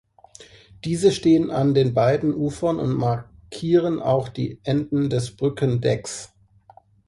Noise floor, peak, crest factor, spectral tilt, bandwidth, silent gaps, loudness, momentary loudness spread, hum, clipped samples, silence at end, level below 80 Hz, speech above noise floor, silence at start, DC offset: -53 dBFS; -6 dBFS; 16 dB; -7 dB/octave; 11.5 kHz; none; -22 LUFS; 11 LU; none; under 0.1%; 0.8 s; -52 dBFS; 32 dB; 0.4 s; under 0.1%